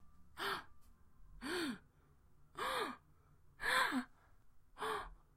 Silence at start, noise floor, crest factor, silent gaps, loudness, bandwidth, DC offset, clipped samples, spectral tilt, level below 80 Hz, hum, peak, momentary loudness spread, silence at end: 0 s; -68 dBFS; 22 dB; none; -41 LUFS; 16 kHz; under 0.1%; under 0.1%; -2.5 dB/octave; -66 dBFS; none; -22 dBFS; 20 LU; 0.2 s